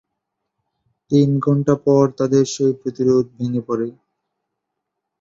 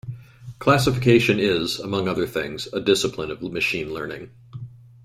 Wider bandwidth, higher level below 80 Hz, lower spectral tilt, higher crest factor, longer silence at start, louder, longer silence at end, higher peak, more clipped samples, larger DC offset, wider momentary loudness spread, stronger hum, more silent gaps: second, 7.8 kHz vs 16 kHz; second, -58 dBFS vs -50 dBFS; first, -7.5 dB/octave vs -5 dB/octave; about the same, 18 dB vs 18 dB; first, 1.1 s vs 0.05 s; first, -18 LUFS vs -22 LUFS; first, 1.3 s vs 0.3 s; about the same, -2 dBFS vs -4 dBFS; neither; neither; second, 8 LU vs 22 LU; neither; neither